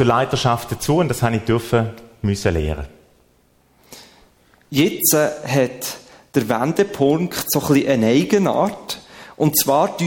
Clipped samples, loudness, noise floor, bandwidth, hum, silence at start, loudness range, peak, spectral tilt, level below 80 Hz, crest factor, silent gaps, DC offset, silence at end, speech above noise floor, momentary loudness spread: under 0.1%; -19 LUFS; -57 dBFS; 17.5 kHz; none; 0 s; 6 LU; -2 dBFS; -5 dB/octave; -40 dBFS; 18 dB; none; under 0.1%; 0 s; 39 dB; 12 LU